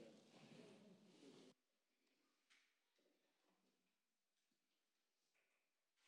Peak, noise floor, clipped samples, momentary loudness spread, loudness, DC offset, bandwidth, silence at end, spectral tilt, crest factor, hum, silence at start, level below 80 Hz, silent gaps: -52 dBFS; under -90 dBFS; under 0.1%; 3 LU; -67 LUFS; under 0.1%; 10 kHz; 0 s; -4.5 dB/octave; 22 dB; none; 0 s; under -90 dBFS; none